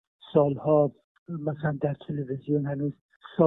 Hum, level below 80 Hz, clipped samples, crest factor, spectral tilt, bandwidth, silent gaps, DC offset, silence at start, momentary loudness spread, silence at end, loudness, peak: none; -64 dBFS; under 0.1%; 18 dB; -12 dB/octave; 4 kHz; 1.04-1.26 s, 3.01-3.09 s, 3.16-3.20 s; under 0.1%; 0.25 s; 11 LU; 0 s; -28 LUFS; -8 dBFS